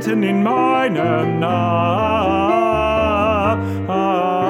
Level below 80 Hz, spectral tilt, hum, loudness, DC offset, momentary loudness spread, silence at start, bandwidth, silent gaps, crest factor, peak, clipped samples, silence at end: -38 dBFS; -7.5 dB/octave; none; -17 LUFS; under 0.1%; 2 LU; 0 s; 16 kHz; none; 12 dB; -4 dBFS; under 0.1%; 0 s